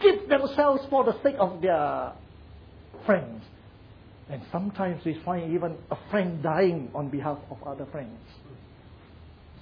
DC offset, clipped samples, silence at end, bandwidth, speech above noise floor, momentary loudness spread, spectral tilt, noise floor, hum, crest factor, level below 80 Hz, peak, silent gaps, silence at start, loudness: under 0.1%; under 0.1%; 0 s; 5.4 kHz; 23 dB; 18 LU; -9 dB/octave; -50 dBFS; none; 20 dB; -56 dBFS; -8 dBFS; none; 0 s; -27 LUFS